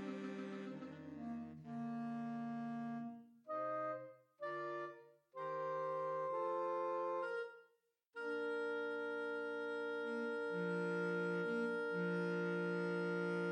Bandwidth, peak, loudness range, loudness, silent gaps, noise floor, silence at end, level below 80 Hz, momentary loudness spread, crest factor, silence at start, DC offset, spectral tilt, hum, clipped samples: 9.8 kHz; -30 dBFS; 6 LU; -43 LUFS; none; -79 dBFS; 0 s; under -90 dBFS; 10 LU; 12 dB; 0 s; under 0.1%; -7.5 dB/octave; none; under 0.1%